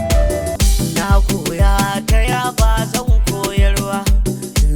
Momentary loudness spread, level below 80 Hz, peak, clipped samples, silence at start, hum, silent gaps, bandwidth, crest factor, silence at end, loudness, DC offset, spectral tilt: 3 LU; -16 dBFS; -2 dBFS; under 0.1%; 0 s; none; none; 18.5 kHz; 12 dB; 0 s; -16 LUFS; under 0.1%; -5 dB/octave